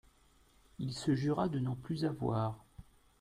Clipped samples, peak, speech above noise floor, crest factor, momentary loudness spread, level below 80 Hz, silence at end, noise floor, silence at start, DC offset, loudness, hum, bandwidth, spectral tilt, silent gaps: under 0.1%; -20 dBFS; 32 dB; 18 dB; 9 LU; -62 dBFS; 0.4 s; -67 dBFS; 0.8 s; under 0.1%; -36 LUFS; none; 14.5 kHz; -7 dB/octave; none